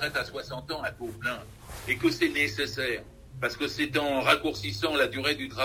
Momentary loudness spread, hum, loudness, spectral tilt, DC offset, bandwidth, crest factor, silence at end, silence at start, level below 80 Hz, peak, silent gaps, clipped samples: 11 LU; none; -28 LUFS; -4 dB/octave; under 0.1%; 16 kHz; 24 dB; 0 s; 0 s; -52 dBFS; -6 dBFS; none; under 0.1%